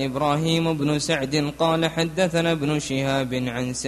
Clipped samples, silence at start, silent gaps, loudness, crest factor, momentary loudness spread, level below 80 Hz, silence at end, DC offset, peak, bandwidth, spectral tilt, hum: under 0.1%; 0 s; none; -23 LUFS; 16 dB; 3 LU; -50 dBFS; 0 s; under 0.1%; -6 dBFS; 13 kHz; -5 dB/octave; none